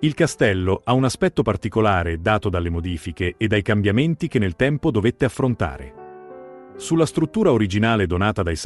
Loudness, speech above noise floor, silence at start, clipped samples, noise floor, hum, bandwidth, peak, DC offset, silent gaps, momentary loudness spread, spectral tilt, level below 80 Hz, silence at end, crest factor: -20 LUFS; 20 dB; 0 s; under 0.1%; -40 dBFS; none; 12 kHz; -4 dBFS; under 0.1%; none; 14 LU; -6.5 dB/octave; -42 dBFS; 0 s; 16 dB